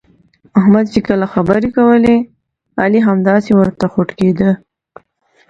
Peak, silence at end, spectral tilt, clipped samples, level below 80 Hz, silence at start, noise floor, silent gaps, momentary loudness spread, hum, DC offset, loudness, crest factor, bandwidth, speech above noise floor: 0 dBFS; 0.95 s; -8.5 dB/octave; under 0.1%; -44 dBFS; 0.55 s; -55 dBFS; none; 6 LU; none; under 0.1%; -13 LUFS; 12 dB; 7.8 kHz; 44 dB